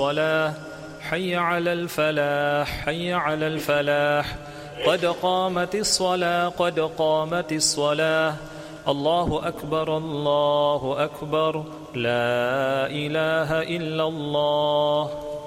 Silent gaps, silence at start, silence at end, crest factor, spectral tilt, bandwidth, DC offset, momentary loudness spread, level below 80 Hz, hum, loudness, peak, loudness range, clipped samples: none; 0 s; 0 s; 16 dB; -4 dB/octave; 16 kHz; under 0.1%; 7 LU; -50 dBFS; none; -23 LUFS; -6 dBFS; 2 LU; under 0.1%